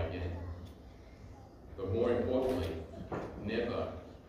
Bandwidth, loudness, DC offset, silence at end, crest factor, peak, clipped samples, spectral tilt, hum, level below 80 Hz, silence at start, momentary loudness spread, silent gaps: 15.5 kHz; -36 LUFS; under 0.1%; 0 s; 18 dB; -20 dBFS; under 0.1%; -7.5 dB/octave; none; -52 dBFS; 0 s; 21 LU; none